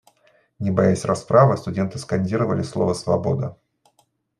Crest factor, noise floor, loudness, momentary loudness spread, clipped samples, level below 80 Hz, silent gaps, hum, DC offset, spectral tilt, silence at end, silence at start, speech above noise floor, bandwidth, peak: 20 dB; -65 dBFS; -21 LUFS; 10 LU; under 0.1%; -56 dBFS; none; none; under 0.1%; -7 dB/octave; 0.85 s; 0.6 s; 45 dB; 11.5 kHz; -2 dBFS